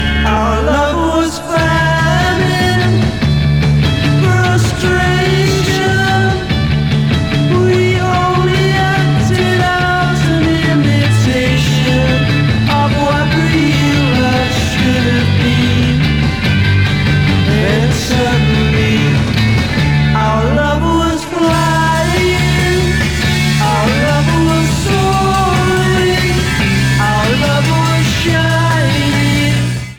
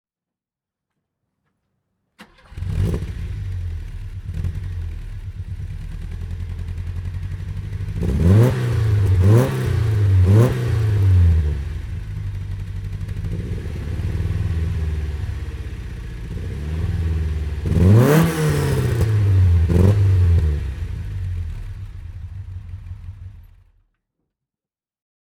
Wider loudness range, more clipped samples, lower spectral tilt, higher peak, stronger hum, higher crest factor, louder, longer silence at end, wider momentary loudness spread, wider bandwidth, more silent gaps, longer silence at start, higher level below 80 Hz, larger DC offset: second, 1 LU vs 14 LU; neither; second, -5.5 dB/octave vs -8 dB/octave; about the same, 0 dBFS vs -2 dBFS; neither; second, 10 dB vs 18 dB; first, -12 LUFS vs -20 LUFS; second, 0 s vs 1.9 s; second, 2 LU vs 18 LU; about the same, 17.5 kHz vs 17.5 kHz; neither; second, 0 s vs 2.2 s; about the same, -24 dBFS vs -28 dBFS; neither